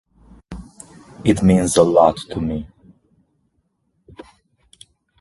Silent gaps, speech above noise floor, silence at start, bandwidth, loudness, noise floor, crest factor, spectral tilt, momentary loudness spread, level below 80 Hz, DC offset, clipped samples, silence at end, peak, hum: none; 52 dB; 0.5 s; 11.5 kHz; -17 LUFS; -68 dBFS; 20 dB; -6 dB/octave; 26 LU; -42 dBFS; under 0.1%; under 0.1%; 2.55 s; 0 dBFS; none